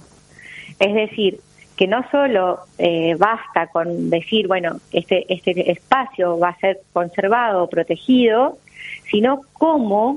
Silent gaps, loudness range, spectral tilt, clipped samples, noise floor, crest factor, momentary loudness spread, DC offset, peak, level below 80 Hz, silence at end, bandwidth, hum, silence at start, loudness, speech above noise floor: none; 1 LU; -6.5 dB/octave; under 0.1%; -44 dBFS; 18 dB; 6 LU; under 0.1%; 0 dBFS; -60 dBFS; 0 s; 11 kHz; none; 0.5 s; -18 LUFS; 26 dB